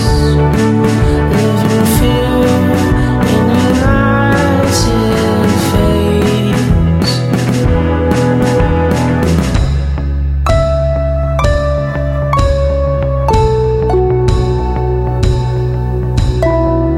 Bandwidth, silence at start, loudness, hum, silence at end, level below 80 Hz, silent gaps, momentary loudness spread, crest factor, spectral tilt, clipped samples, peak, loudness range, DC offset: 16.5 kHz; 0 s; -12 LUFS; none; 0 s; -18 dBFS; none; 4 LU; 10 dB; -6.5 dB/octave; under 0.1%; 0 dBFS; 2 LU; under 0.1%